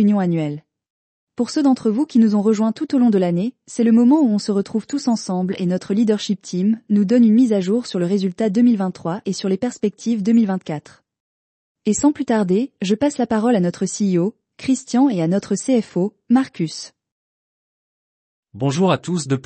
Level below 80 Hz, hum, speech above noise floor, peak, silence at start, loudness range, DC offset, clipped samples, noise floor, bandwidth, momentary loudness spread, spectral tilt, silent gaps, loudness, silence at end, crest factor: -62 dBFS; none; over 72 dB; -6 dBFS; 0 s; 5 LU; under 0.1%; under 0.1%; under -90 dBFS; 8.8 kHz; 9 LU; -6.5 dB/octave; 0.90-1.27 s, 11.20-11.75 s, 17.12-18.43 s; -19 LUFS; 0.05 s; 14 dB